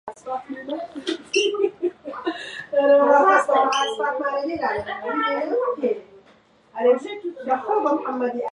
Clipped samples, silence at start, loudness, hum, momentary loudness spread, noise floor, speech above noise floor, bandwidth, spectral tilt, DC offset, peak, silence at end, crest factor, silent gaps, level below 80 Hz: under 0.1%; 0.05 s; -22 LUFS; none; 15 LU; -55 dBFS; 34 dB; 11 kHz; -3 dB/octave; under 0.1%; -4 dBFS; 0.05 s; 18 dB; none; -64 dBFS